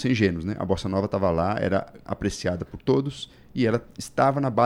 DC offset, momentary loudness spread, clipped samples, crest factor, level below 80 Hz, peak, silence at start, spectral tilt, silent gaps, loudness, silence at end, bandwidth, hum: under 0.1%; 9 LU; under 0.1%; 18 dB; -48 dBFS; -6 dBFS; 0 s; -6.5 dB/octave; none; -25 LUFS; 0 s; 15.5 kHz; none